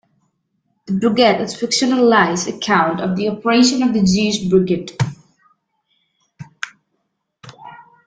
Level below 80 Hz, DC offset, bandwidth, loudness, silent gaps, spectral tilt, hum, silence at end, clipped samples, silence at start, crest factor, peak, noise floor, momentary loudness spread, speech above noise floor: -52 dBFS; under 0.1%; 9.4 kHz; -16 LUFS; none; -4.5 dB/octave; none; 0.25 s; under 0.1%; 0.9 s; 18 dB; 0 dBFS; -72 dBFS; 12 LU; 56 dB